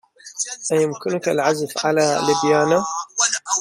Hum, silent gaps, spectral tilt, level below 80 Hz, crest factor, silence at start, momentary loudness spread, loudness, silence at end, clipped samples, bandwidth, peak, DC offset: none; none; -3 dB/octave; -64 dBFS; 16 dB; 0.25 s; 8 LU; -19 LUFS; 0 s; under 0.1%; 15.5 kHz; -4 dBFS; under 0.1%